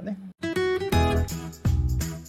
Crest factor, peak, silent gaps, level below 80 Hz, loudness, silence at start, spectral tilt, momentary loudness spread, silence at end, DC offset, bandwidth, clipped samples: 16 dB; -10 dBFS; none; -32 dBFS; -26 LUFS; 0 s; -6 dB/octave; 9 LU; 0 s; under 0.1%; 16 kHz; under 0.1%